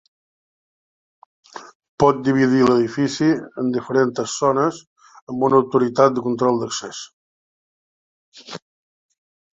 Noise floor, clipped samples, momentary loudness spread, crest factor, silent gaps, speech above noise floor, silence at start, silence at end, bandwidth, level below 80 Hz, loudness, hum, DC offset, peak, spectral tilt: under -90 dBFS; under 0.1%; 21 LU; 20 dB; 1.75-1.80 s, 1.88-1.98 s, 4.87-4.96 s, 5.22-5.27 s, 7.13-8.32 s; over 72 dB; 1.55 s; 0.95 s; 8 kHz; -60 dBFS; -19 LUFS; none; under 0.1%; -2 dBFS; -5.5 dB/octave